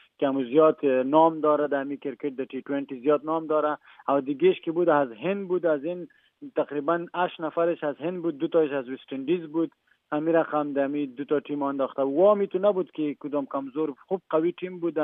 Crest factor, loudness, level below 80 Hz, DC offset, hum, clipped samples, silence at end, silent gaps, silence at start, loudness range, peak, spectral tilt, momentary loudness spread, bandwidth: 20 dB; -26 LUFS; -86 dBFS; under 0.1%; none; under 0.1%; 0 s; none; 0.2 s; 4 LU; -6 dBFS; -10 dB/octave; 11 LU; 3.9 kHz